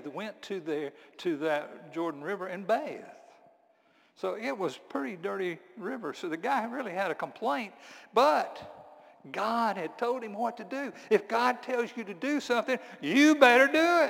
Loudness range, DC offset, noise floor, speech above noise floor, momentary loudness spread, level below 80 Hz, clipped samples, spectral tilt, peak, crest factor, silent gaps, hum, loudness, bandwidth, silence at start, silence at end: 8 LU; under 0.1%; -66 dBFS; 36 dB; 16 LU; -80 dBFS; under 0.1%; -4 dB/octave; -6 dBFS; 24 dB; none; none; -29 LUFS; 17 kHz; 0 s; 0 s